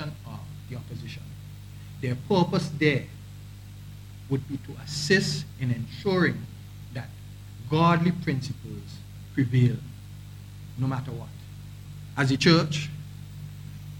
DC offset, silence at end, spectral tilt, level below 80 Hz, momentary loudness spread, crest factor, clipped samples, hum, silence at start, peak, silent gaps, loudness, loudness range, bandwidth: under 0.1%; 0 s; -6 dB/octave; -52 dBFS; 21 LU; 22 dB; under 0.1%; 50 Hz at -45 dBFS; 0 s; -6 dBFS; none; -26 LUFS; 3 LU; 17.5 kHz